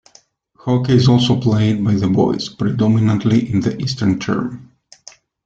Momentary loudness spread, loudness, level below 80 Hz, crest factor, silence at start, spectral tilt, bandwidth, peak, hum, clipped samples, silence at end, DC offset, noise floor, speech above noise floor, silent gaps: 8 LU; -16 LUFS; -48 dBFS; 14 dB; 0.65 s; -7 dB/octave; 7.8 kHz; -2 dBFS; none; under 0.1%; 0.8 s; under 0.1%; -52 dBFS; 37 dB; none